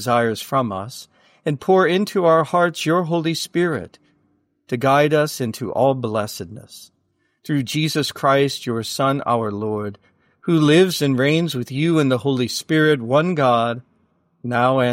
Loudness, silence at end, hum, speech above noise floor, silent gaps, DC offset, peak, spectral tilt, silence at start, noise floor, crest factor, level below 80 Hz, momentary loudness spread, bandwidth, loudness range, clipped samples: -19 LUFS; 0 s; none; 47 dB; none; under 0.1%; -4 dBFS; -5.5 dB/octave; 0 s; -65 dBFS; 16 dB; -62 dBFS; 13 LU; 16.5 kHz; 4 LU; under 0.1%